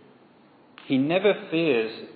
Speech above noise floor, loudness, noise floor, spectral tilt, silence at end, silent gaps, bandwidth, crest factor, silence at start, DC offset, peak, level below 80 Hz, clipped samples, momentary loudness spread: 32 dB; -24 LUFS; -55 dBFS; -9.5 dB/octave; 0.05 s; none; 4.8 kHz; 18 dB; 0.85 s; under 0.1%; -8 dBFS; -80 dBFS; under 0.1%; 4 LU